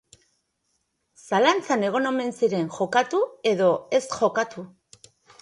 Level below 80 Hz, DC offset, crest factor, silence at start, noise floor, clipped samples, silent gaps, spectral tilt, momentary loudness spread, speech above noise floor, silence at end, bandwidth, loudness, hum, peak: -70 dBFS; under 0.1%; 20 dB; 1.25 s; -74 dBFS; under 0.1%; none; -4.5 dB/octave; 7 LU; 51 dB; 0.75 s; 11.5 kHz; -23 LUFS; none; -6 dBFS